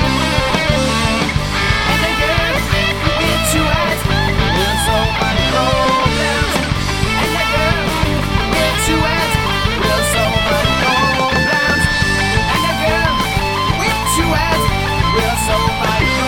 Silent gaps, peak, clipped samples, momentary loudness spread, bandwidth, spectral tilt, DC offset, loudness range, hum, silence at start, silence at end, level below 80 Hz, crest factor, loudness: none; 0 dBFS; under 0.1%; 3 LU; 17.5 kHz; -4 dB/octave; 0.2%; 1 LU; none; 0 s; 0 s; -24 dBFS; 14 dB; -14 LUFS